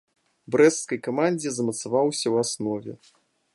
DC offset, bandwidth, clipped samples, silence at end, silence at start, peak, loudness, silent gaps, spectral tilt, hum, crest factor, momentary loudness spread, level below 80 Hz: under 0.1%; 11.5 kHz; under 0.1%; 0.6 s; 0.5 s; -6 dBFS; -24 LUFS; none; -4 dB/octave; none; 20 dB; 10 LU; -70 dBFS